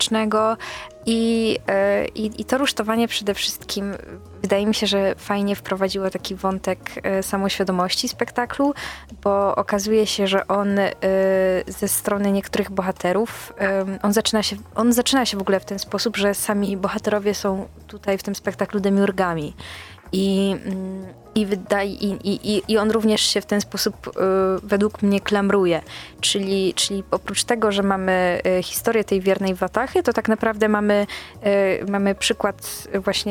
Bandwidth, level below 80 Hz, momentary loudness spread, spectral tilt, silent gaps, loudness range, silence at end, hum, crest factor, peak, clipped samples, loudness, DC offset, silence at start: 18 kHz; -48 dBFS; 8 LU; -4 dB/octave; none; 3 LU; 0 s; none; 18 dB; -2 dBFS; under 0.1%; -21 LUFS; under 0.1%; 0 s